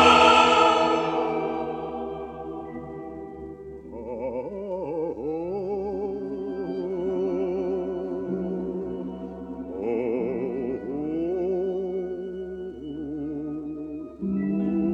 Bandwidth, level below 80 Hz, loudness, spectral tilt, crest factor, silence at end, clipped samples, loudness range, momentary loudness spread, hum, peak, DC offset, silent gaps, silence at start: 10.5 kHz; -52 dBFS; -26 LUFS; -5 dB/octave; 22 dB; 0 s; under 0.1%; 7 LU; 14 LU; none; -4 dBFS; under 0.1%; none; 0 s